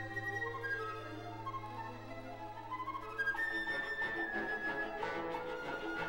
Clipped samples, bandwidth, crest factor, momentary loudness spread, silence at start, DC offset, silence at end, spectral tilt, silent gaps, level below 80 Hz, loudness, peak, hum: under 0.1%; 17.5 kHz; 14 dB; 10 LU; 0 s; 0.1%; 0 s; -5 dB/octave; none; -60 dBFS; -40 LUFS; -26 dBFS; none